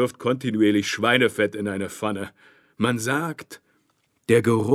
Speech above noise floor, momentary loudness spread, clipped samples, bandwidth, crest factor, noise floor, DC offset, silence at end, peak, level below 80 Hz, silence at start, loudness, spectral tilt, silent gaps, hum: 46 dB; 15 LU; under 0.1%; 15.5 kHz; 20 dB; -68 dBFS; under 0.1%; 0 s; -4 dBFS; -68 dBFS; 0 s; -23 LUFS; -5 dB/octave; none; none